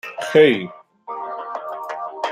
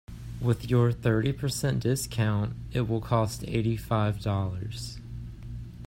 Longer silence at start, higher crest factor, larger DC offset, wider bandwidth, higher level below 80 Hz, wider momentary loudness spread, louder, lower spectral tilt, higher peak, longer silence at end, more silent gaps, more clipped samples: about the same, 0.05 s vs 0.1 s; about the same, 20 dB vs 18 dB; neither; second, 13 kHz vs 16 kHz; second, -70 dBFS vs -46 dBFS; about the same, 18 LU vs 16 LU; first, -20 LUFS vs -28 LUFS; about the same, -5.5 dB/octave vs -6.5 dB/octave; first, -2 dBFS vs -10 dBFS; about the same, 0 s vs 0 s; neither; neither